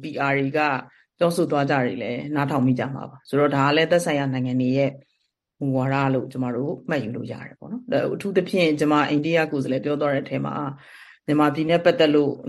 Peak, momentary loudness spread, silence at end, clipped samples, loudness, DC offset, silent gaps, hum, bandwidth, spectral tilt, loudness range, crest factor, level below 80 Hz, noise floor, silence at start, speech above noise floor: -4 dBFS; 11 LU; 0 s; under 0.1%; -22 LUFS; under 0.1%; none; none; 12.5 kHz; -6.5 dB/octave; 3 LU; 18 dB; -64 dBFS; -73 dBFS; 0 s; 51 dB